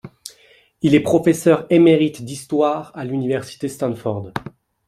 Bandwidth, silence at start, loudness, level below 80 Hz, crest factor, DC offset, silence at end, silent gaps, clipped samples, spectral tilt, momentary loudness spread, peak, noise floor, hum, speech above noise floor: 14 kHz; 0.05 s; -18 LUFS; -56 dBFS; 16 dB; under 0.1%; 0.4 s; none; under 0.1%; -6.5 dB/octave; 18 LU; -2 dBFS; -53 dBFS; none; 36 dB